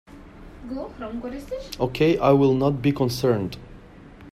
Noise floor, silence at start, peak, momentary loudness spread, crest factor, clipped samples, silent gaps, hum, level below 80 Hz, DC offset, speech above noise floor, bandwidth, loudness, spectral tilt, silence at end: -45 dBFS; 0.1 s; -4 dBFS; 16 LU; 20 dB; under 0.1%; none; none; -46 dBFS; under 0.1%; 23 dB; 16 kHz; -23 LUFS; -7 dB/octave; 0.05 s